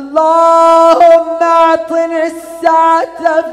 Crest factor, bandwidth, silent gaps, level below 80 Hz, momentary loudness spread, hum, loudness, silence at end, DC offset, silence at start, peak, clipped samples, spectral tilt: 8 dB; 12.5 kHz; none; -54 dBFS; 9 LU; none; -9 LUFS; 0 s; under 0.1%; 0 s; 0 dBFS; 0.9%; -3 dB/octave